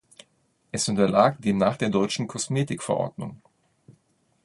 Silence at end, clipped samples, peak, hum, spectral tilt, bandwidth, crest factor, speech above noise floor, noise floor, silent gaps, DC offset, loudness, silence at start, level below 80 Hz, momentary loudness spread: 0.55 s; under 0.1%; -4 dBFS; none; -5 dB/octave; 11.5 kHz; 22 dB; 43 dB; -67 dBFS; none; under 0.1%; -24 LUFS; 0.75 s; -60 dBFS; 12 LU